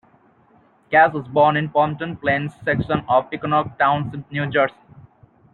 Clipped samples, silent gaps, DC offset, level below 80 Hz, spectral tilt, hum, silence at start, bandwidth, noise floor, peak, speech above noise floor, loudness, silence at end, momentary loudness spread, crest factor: under 0.1%; none; under 0.1%; -54 dBFS; -8.5 dB/octave; none; 0.9 s; 4.5 kHz; -55 dBFS; -2 dBFS; 36 dB; -20 LUFS; 0.85 s; 8 LU; 18 dB